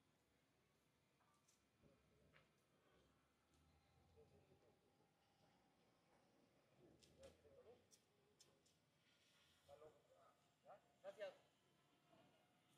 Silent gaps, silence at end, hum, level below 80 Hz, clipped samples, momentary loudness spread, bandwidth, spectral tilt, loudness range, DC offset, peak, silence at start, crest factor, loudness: none; 0 s; none; under -90 dBFS; under 0.1%; 12 LU; 10.5 kHz; -4 dB/octave; 0 LU; under 0.1%; -44 dBFS; 0 s; 28 dB; -63 LUFS